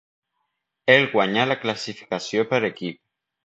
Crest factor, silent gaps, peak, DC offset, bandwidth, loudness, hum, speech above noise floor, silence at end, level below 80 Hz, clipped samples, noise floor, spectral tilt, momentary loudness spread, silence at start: 22 dB; none; -2 dBFS; under 0.1%; 8 kHz; -21 LUFS; none; 55 dB; 0.55 s; -68 dBFS; under 0.1%; -77 dBFS; -4.5 dB/octave; 14 LU; 0.85 s